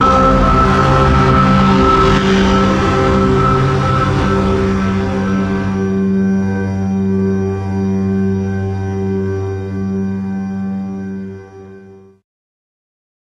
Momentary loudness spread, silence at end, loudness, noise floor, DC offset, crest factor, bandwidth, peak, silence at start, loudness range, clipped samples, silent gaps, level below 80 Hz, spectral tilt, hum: 11 LU; 1.3 s; -14 LUFS; -39 dBFS; under 0.1%; 12 dB; 8.8 kHz; -2 dBFS; 0 s; 11 LU; under 0.1%; none; -26 dBFS; -7 dB/octave; none